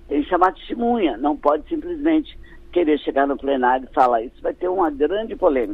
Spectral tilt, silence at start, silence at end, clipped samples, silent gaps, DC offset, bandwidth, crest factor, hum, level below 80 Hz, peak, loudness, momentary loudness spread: -7 dB/octave; 0.1 s; 0 s; under 0.1%; none; under 0.1%; 5.4 kHz; 18 dB; none; -42 dBFS; -2 dBFS; -20 LUFS; 6 LU